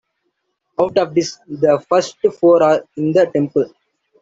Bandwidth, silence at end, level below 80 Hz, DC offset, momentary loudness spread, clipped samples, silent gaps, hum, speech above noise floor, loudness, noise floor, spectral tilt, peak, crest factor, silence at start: 8 kHz; 0.55 s; -60 dBFS; under 0.1%; 8 LU; under 0.1%; none; none; 55 dB; -16 LUFS; -71 dBFS; -6 dB/octave; -2 dBFS; 14 dB; 0.8 s